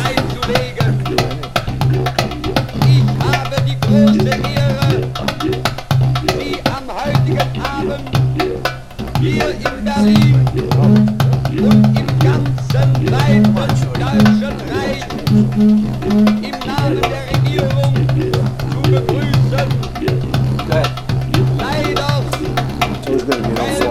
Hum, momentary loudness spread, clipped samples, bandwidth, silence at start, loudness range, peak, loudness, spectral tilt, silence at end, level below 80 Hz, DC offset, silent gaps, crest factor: none; 8 LU; under 0.1%; 14.5 kHz; 0 s; 4 LU; 0 dBFS; -15 LUFS; -7 dB/octave; 0 s; -32 dBFS; under 0.1%; none; 14 dB